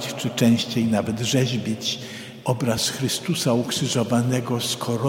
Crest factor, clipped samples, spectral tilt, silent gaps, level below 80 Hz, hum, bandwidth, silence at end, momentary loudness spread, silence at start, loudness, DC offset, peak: 16 dB; under 0.1%; -4.5 dB/octave; none; -58 dBFS; none; 16.5 kHz; 0 s; 7 LU; 0 s; -23 LUFS; under 0.1%; -6 dBFS